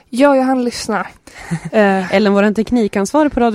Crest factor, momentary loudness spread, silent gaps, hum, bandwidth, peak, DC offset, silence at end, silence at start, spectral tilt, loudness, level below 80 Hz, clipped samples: 14 dB; 13 LU; none; none; 15 kHz; 0 dBFS; under 0.1%; 0 s; 0.1 s; -5.5 dB/octave; -14 LUFS; -42 dBFS; under 0.1%